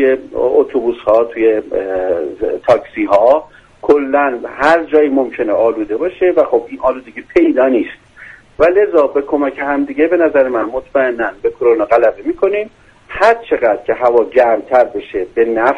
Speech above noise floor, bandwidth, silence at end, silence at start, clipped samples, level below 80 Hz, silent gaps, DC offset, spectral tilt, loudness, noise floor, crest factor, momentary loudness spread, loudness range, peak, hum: 25 dB; 8.6 kHz; 0 s; 0 s; under 0.1%; -46 dBFS; none; under 0.1%; -6.5 dB/octave; -14 LUFS; -38 dBFS; 14 dB; 7 LU; 1 LU; 0 dBFS; none